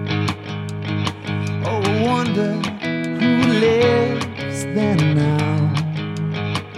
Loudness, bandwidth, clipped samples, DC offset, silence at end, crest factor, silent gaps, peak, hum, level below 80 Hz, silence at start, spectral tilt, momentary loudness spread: -20 LUFS; 12.5 kHz; under 0.1%; under 0.1%; 0 s; 16 dB; none; -4 dBFS; none; -52 dBFS; 0 s; -6.5 dB/octave; 9 LU